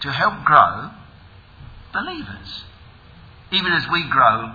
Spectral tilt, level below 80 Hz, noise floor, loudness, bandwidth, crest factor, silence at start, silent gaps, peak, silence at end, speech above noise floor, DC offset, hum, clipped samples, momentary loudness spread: -6 dB/octave; -48 dBFS; -45 dBFS; -17 LUFS; 5.4 kHz; 20 dB; 0 s; none; 0 dBFS; 0 s; 27 dB; under 0.1%; none; under 0.1%; 20 LU